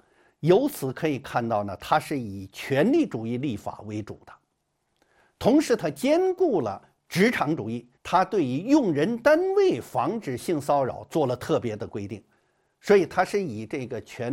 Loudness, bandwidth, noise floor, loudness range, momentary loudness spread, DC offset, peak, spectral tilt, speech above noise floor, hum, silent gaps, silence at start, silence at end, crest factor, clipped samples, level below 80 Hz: -25 LUFS; 16.5 kHz; -75 dBFS; 4 LU; 14 LU; under 0.1%; -6 dBFS; -6 dB/octave; 51 dB; none; none; 0.4 s; 0 s; 18 dB; under 0.1%; -62 dBFS